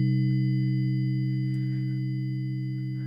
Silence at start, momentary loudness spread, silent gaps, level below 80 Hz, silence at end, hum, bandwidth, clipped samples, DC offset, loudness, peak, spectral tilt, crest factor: 0 s; 6 LU; none; -68 dBFS; 0 s; none; 5 kHz; under 0.1%; under 0.1%; -28 LUFS; -16 dBFS; -10 dB/octave; 10 dB